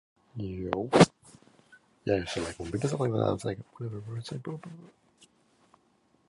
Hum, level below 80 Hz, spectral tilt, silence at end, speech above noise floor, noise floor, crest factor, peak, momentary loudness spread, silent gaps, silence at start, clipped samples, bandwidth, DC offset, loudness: none; -56 dBFS; -6 dB/octave; 1.4 s; 39 dB; -68 dBFS; 28 dB; -4 dBFS; 18 LU; none; 0.35 s; under 0.1%; 11.5 kHz; under 0.1%; -30 LUFS